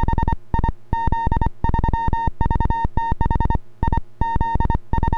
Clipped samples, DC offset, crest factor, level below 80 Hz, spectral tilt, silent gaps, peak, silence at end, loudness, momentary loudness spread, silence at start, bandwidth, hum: under 0.1%; under 0.1%; 14 dB; -22 dBFS; -9 dB/octave; none; -4 dBFS; 0 s; -23 LUFS; 3 LU; 0 s; 4.9 kHz; none